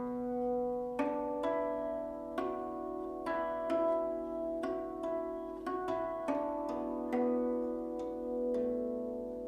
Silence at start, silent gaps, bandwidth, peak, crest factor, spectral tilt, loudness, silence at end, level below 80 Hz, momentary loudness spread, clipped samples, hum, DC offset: 0 s; none; 12.5 kHz; -20 dBFS; 16 dB; -7 dB/octave; -36 LUFS; 0 s; -62 dBFS; 7 LU; under 0.1%; none; under 0.1%